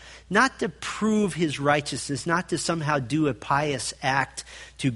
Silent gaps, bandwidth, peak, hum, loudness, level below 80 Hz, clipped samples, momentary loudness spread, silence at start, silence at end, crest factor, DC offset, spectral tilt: none; 11.5 kHz; -4 dBFS; none; -25 LUFS; -54 dBFS; under 0.1%; 8 LU; 0 s; 0 s; 22 dB; under 0.1%; -4.5 dB/octave